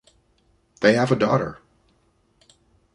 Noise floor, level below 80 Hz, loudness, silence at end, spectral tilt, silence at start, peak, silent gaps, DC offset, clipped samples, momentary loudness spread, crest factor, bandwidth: -64 dBFS; -58 dBFS; -21 LUFS; 1.4 s; -6.5 dB/octave; 0.8 s; -2 dBFS; none; under 0.1%; under 0.1%; 7 LU; 22 dB; 10.5 kHz